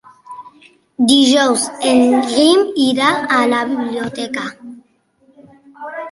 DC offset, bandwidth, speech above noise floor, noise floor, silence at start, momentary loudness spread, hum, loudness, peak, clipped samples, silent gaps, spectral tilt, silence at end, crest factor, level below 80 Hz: under 0.1%; 11.5 kHz; 42 dB; -55 dBFS; 0.3 s; 21 LU; none; -14 LUFS; 0 dBFS; under 0.1%; none; -2.5 dB/octave; 0 s; 16 dB; -60 dBFS